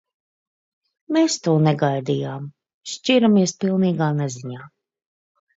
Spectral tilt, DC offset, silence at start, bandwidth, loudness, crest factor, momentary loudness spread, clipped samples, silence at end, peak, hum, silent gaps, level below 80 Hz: -5.5 dB/octave; under 0.1%; 1.1 s; 8 kHz; -20 LUFS; 16 dB; 17 LU; under 0.1%; 0.9 s; -6 dBFS; none; 2.74-2.81 s; -68 dBFS